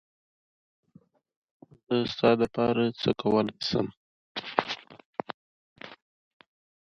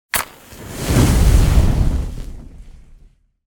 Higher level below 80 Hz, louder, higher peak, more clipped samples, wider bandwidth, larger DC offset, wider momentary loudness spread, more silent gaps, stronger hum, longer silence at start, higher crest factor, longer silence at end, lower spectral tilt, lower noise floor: second, -64 dBFS vs -18 dBFS; second, -28 LUFS vs -17 LUFS; about the same, -2 dBFS vs 0 dBFS; neither; second, 7.4 kHz vs 17.5 kHz; neither; about the same, 20 LU vs 20 LU; first, 3.97-4.35 s, 5.05-5.13 s, 5.34-5.76 s vs none; neither; first, 1.9 s vs 0.15 s; first, 28 dB vs 16 dB; about the same, 0.9 s vs 0.8 s; about the same, -6.5 dB/octave vs -5.5 dB/octave; first, -60 dBFS vs -49 dBFS